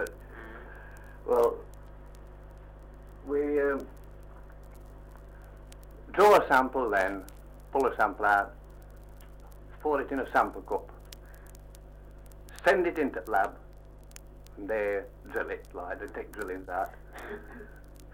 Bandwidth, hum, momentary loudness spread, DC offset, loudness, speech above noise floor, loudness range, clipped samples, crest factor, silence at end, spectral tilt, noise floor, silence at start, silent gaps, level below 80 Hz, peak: 16.5 kHz; 50 Hz at -50 dBFS; 25 LU; under 0.1%; -29 LUFS; 20 dB; 9 LU; under 0.1%; 24 dB; 0.05 s; -5 dB/octave; -49 dBFS; 0 s; none; -48 dBFS; -8 dBFS